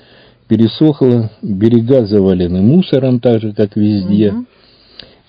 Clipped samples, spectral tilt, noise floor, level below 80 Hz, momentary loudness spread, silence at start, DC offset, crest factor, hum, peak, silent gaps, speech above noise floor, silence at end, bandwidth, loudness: 0.5%; -10.5 dB/octave; -45 dBFS; -38 dBFS; 6 LU; 0.5 s; under 0.1%; 12 dB; none; 0 dBFS; none; 33 dB; 0.85 s; 5.2 kHz; -12 LUFS